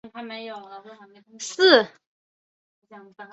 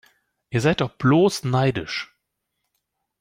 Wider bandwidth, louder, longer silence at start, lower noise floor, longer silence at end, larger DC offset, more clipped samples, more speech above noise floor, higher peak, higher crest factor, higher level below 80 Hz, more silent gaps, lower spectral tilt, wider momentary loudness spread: second, 8.2 kHz vs 15.5 kHz; first, -18 LUFS vs -21 LUFS; second, 0.05 s vs 0.5 s; first, under -90 dBFS vs -78 dBFS; second, 0.1 s vs 1.15 s; neither; neither; first, over 66 dB vs 58 dB; about the same, -4 dBFS vs -6 dBFS; first, 22 dB vs 16 dB; second, -74 dBFS vs -54 dBFS; first, 2.06-2.82 s vs none; second, -2 dB/octave vs -6 dB/octave; first, 27 LU vs 12 LU